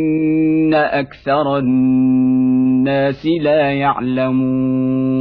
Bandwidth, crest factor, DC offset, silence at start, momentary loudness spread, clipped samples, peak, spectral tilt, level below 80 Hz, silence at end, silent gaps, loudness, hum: 5 kHz; 10 dB; under 0.1%; 0 s; 4 LU; under 0.1%; -4 dBFS; -10 dB/octave; -48 dBFS; 0 s; none; -15 LUFS; none